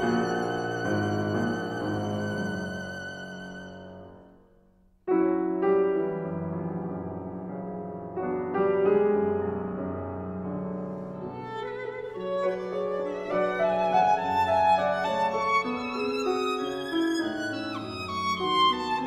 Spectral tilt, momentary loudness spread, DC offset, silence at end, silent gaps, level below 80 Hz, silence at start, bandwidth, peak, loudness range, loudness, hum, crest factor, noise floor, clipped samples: -6 dB/octave; 13 LU; under 0.1%; 0 s; none; -60 dBFS; 0 s; 12.5 kHz; -10 dBFS; 8 LU; -28 LUFS; none; 18 dB; -61 dBFS; under 0.1%